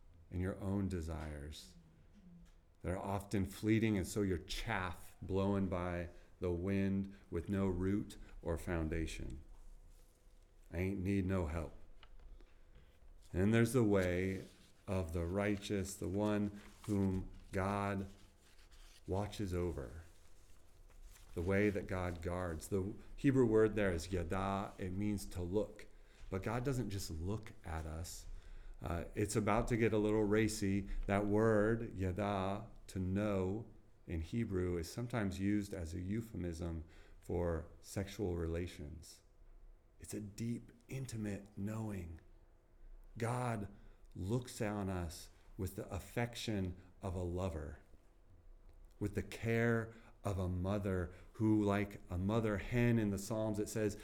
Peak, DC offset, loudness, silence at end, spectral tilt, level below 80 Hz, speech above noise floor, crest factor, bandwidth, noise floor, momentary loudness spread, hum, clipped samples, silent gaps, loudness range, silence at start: -20 dBFS; under 0.1%; -39 LUFS; 0 s; -6.5 dB/octave; -54 dBFS; 26 dB; 18 dB; 17.5 kHz; -64 dBFS; 15 LU; none; under 0.1%; none; 8 LU; 0.1 s